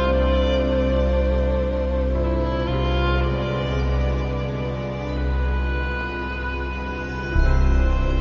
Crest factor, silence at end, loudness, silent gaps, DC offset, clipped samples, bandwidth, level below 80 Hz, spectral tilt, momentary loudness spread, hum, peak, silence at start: 16 dB; 0 s; -23 LUFS; none; under 0.1%; under 0.1%; 6.4 kHz; -22 dBFS; -6 dB/octave; 7 LU; none; -4 dBFS; 0 s